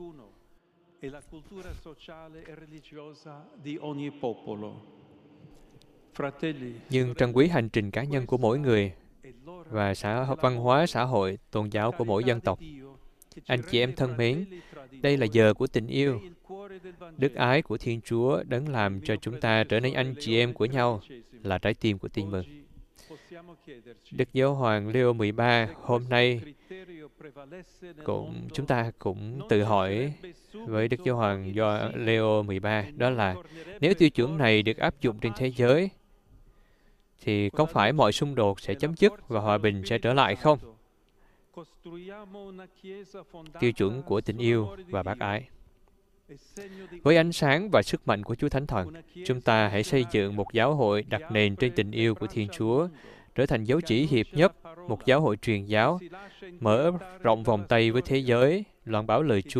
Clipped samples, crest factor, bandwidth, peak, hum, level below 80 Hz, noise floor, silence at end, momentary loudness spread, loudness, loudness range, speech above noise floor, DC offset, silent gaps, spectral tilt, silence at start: under 0.1%; 22 dB; 13.5 kHz; -6 dBFS; none; -54 dBFS; -63 dBFS; 0 s; 22 LU; -26 LUFS; 8 LU; 36 dB; under 0.1%; none; -6.5 dB/octave; 0 s